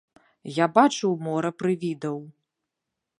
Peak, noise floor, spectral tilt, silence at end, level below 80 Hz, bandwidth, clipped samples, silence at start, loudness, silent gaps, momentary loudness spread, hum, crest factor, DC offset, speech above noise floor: -4 dBFS; -84 dBFS; -5.5 dB/octave; 0.9 s; -76 dBFS; 11.5 kHz; under 0.1%; 0.45 s; -24 LUFS; none; 13 LU; none; 22 dB; under 0.1%; 61 dB